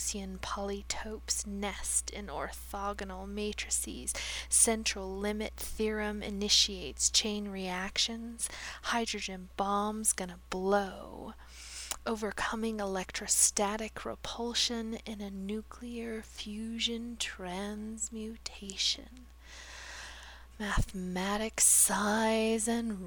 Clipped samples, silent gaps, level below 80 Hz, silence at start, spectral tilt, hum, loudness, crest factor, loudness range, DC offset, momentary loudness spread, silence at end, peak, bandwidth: under 0.1%; none; -48 dBFS; 0 s; -2 dB/octave; none; -32 LUFS; 22 dB; 8 LU; under 0.1%; 16 LU; 0 s; -12 dBFS; over 20 kHz